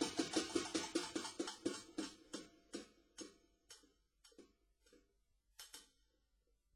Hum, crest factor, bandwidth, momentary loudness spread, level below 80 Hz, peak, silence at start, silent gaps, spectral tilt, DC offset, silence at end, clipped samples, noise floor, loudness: none; 24 dB; 16 kHz; 22 LU; -76 dBFS; -24 dBFS; 0 s; none; -2.5 dB/octave; under 0.1%; 0.9 s; under 0.1%; -81 dBFS; -45 LUFS